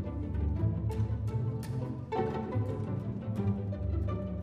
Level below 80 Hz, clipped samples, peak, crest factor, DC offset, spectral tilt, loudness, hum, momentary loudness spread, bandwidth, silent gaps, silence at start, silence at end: -42 dBFS; under 0.1%; -18 dBFS; 14 dB; under 0.1%; -9.5 dB/octave; -34 LUFS; none; 4 LU; 10 kHz; none; 0 s; 0 s